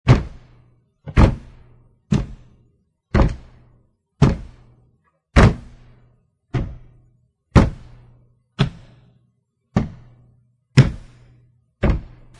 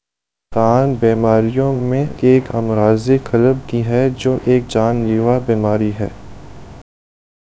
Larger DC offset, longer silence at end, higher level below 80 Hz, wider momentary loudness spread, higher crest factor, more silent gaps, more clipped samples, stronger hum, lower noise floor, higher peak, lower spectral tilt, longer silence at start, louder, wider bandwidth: second, under 0.1% vs 1%; second, 0.3 s vs 0.6 s; first, -28 dBFS vs -42 dBFS; first, 19 LU vs 5 LU; first, 22 dB vs 16 dB; neither; neither; neither; second, -66 dBFS vs -83 dBFS; about the same, 0 dBFS vs 0 dBFS; about the same, -7.5 dB/octave vs -8.5 dB/octave; second, 0.05 s vs 0.5 s; second, -20 LUFS vs -15 LUFS; first, 10.5 kHz vs 8 kHz